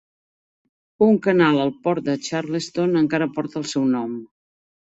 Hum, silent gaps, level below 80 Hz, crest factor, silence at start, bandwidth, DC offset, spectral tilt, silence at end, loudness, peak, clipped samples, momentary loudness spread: none; none; -62 dBFS; 18 dB; 1 s; 8.2 kHz; under 0.1%; -6 dB/octave; 0.7 s; -21 LUFS; -4 dBFS; under 0.1%; 9 LU